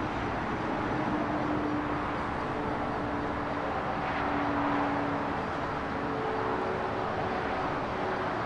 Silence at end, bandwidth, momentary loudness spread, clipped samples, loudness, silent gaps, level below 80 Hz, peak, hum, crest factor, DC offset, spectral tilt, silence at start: 0 s; 10.5 kHz; 3 LU; under 0.1%; -31 LUFS; none; -50 dBFS; -18 dBFS; none; 14 dB; under 0.1%; -7 dB/octave; 0 s